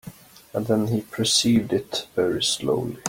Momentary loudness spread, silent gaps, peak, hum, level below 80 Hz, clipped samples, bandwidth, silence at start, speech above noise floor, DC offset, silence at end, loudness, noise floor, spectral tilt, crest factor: 9 LU; none; -6 dBFS; none; -56 dBFS; under 0.1%; 16.5 kHz; 0.05 s; 21 dB; under 0.1%; 0 s; -23 LUFS; -44 dBFS; -4 dB/octave; 18 dB